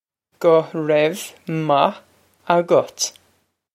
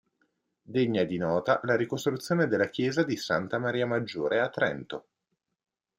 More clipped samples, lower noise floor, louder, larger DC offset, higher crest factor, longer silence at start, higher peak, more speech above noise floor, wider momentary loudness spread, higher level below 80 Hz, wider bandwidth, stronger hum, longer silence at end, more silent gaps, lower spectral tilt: neither; second, -64 dBFS vs -82 dBFS; first, -19 LUFS vs -28 LUFS; neither; about the same, 20 dB vs 18 dB; second, 0.4 s vs 0.7 s; first, 0 dBFS vs -10 dBFS; second, 46 dB vs 54 dB; first, 8 LU vs 4 LU; about the same, -72 dBFS vs -68 dBFS; about the same, 15.5 kHz vs 15.5 kHz; neither; second, 0.65 s vs 1 s; neither; second, -4.5 dB/octave vs -6 dB/octave